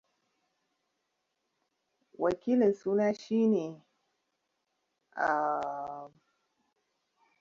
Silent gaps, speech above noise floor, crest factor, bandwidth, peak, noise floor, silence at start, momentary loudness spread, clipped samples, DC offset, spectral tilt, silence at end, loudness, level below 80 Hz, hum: none; 53 dB; 18 dB; 7.2 kHz; -16 dBFS; -82 dBFS; 2.2 s; 15 LU; under 0.1%; under 0.1%; -7 dB/octave; 1.35 s; -30 LUFS; -74 dBFS; none